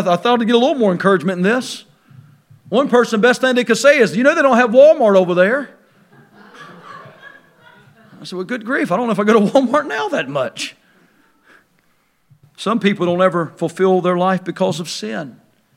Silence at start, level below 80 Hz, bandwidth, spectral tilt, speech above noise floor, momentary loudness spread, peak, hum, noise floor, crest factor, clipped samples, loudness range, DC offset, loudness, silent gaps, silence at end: 0 s; -70 dBFS; 15 kHz; -5.5 dB/octave; 45 dB; 15 LU; 0 dBFS; none; -60 dBFS; 16 dB; under 0.1%; 11 LU; under 0.1%; -15 LUFS; none; 0.45 s